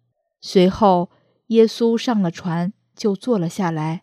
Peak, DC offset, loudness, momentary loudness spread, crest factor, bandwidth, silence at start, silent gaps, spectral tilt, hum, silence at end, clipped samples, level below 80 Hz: -2 dBFS; under 0.1%; -19 LUFS; 10 LU; 18 dB; 13.5 kHz; 0.45 s; none; -6.5 dB/octave; none; 0.05 s; under 0.1%; -52 dBFS